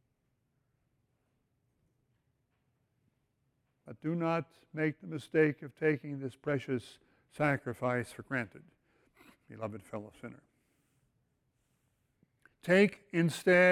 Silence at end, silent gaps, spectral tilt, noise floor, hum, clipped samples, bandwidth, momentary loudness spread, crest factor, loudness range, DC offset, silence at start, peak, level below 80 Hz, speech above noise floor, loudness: 0 s; none; -6.5 dB/octave; -79 dBFS; none; under 0.1%; 16 kHz; 18 LU; 22 dB; 15 LU; under 0.1%; 3.85 s; -14 dBFS; -72 dBFS; 47 dB; -33 LUFS